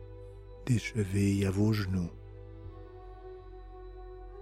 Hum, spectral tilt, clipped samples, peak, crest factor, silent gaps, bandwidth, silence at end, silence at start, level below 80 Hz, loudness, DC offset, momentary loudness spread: none; -7 dB/octave; under 0.1%; -16 dBFS; 18 dB; none; 15.5 kHz; 0 s; 0 s; -50 dBFS; -31 LUFS; under 0.1%; 21 LU